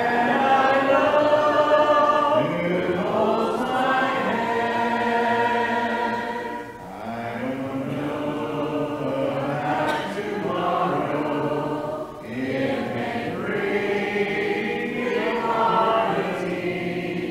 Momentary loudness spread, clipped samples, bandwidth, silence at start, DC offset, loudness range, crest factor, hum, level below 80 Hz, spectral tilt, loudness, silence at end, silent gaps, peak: 10 LU; under 0.1%; 16 kHz; 0 s; under 0.1%; 7 LU; 16 dB; none; -56 dBFS; -6 dB/octave; -23 LUFS; 0 s; none; -6 dBFS